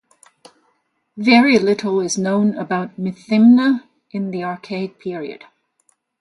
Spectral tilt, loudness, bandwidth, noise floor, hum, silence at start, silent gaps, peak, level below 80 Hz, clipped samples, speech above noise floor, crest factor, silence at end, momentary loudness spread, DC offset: -5 dB/octave; -17 LUFS; 11 kHz; -66 dBFS; none; 1.15 s; none; 0 dBFS; -64 dBFS; under 0.1%; 50 dB; 18 dB; 0.85 s; 16 LU; under 0.1%